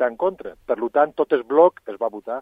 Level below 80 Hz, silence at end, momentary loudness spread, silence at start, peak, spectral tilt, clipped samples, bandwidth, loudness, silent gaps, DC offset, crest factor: -62 dBFS; 0 s; 11 LU; 0 s; -2 dBFS; -7.5 dB/octave; under 0.1%; 4.7 kHz; -21 LUFS; none; under 0.1%; 18 dB